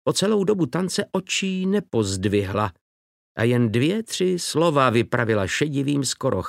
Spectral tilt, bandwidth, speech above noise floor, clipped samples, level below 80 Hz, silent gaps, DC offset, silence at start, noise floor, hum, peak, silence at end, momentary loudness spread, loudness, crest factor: -5 dB/octave; 16 kHz; over 68 dB; under 0.1%; -56 dBFS; 2.81-3.35 s; under 0.1%; 0.05 s; under -90 dBFS; none; -4 dBFS; 0 s; 5 LU; -22 LUFS; 18 dB